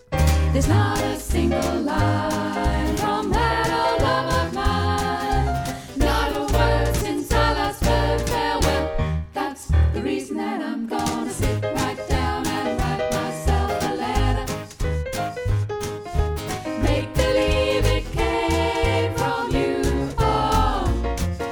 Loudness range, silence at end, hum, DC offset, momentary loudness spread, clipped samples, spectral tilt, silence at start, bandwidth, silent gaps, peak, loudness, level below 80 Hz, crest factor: 3 LU; 0 s; none; under 0.1%; 6 LU; under 0.1%; -5.5 dB/octave; 0.1 s; over 20 kHz; none; -4 dBFS; -22 LUFS; -28 dBFS; 16 dB